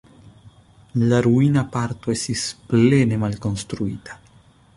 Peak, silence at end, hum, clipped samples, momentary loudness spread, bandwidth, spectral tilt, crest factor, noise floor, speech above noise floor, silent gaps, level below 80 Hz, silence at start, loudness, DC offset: -4 dBFS; 0.6 s; none; under 0.1%; 12 LU; 11.5 kHz; -6 dB/octave; 18 dB; -52 dBFS; 33 dB; none; -48 dBFS; 0.25 s; -20 LUFS; under 0.1%